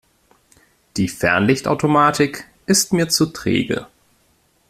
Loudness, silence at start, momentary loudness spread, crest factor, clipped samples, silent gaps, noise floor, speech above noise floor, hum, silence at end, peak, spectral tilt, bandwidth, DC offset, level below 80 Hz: -18 LUFS; 0.95 s; 10 LU; 18 dB; under 0.1%; none; -60 dBFS; 43 dB; none; 0.85 s; -2 dBFS; -4 dB/octave; 16 kHz; under 0.1%; -52 dBFS